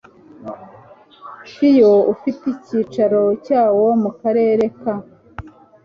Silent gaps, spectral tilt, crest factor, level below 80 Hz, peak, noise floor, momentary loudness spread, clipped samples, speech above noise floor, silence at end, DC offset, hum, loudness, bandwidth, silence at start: none; -8.5 dB/octave; 14 dB; -54 dBFS; -2 dBFS; -44 dBFS; 24 LU; under 0.1%; 29 dB; 0.35 s; under 0.1%; none; -16 LUFS; 6.8 kHz; 0.4 s